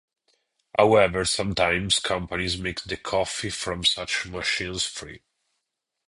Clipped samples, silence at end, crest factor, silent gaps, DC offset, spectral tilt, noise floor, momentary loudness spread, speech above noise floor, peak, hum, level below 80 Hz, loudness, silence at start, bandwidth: under 0.1%; 0.9 s; 22 dB; none; under 0.1%; -3 dB/octave; -81 dBFS; 10 LU; 56 dB; -4 dBFS; none; -48 dBFS; -24 LUFS; 0.75 s; 11.5 kHz